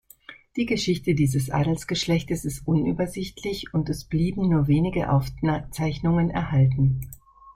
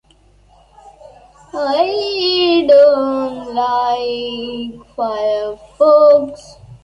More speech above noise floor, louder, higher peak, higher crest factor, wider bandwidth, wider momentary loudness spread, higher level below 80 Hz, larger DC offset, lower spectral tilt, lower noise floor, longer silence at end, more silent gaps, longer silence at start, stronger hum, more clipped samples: second, 25 dB vs 37 dB; second, -24 LUFS vs -14 LUFS; second, -10 dBFS vs -2 dBFS; about the same, 14 dB vs 14 dB; first, 16 kHz vs 8 kHz; second, 8 LU vs 16 LU; first, -42 dBFS vs -52 dBFS; neither; first, -6.5 dB/octave vs -5 dB/octave; about the same, -48 dBFS vs -50 dBFS; about the same, 0.05 s vs 0.05 s; neither; second, 0.3 s vs 1.55 s; neither; neither